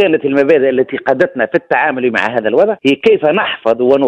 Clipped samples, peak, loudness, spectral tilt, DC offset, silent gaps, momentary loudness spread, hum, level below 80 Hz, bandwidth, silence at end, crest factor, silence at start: under 0.1%; 0 dBFS; -13 LUFS; -6.5 dB/octave; under 0.1%; none; 4 LU; none; -56 dBFS; 8.8 kHz; 0 s; 12 dB; 0 s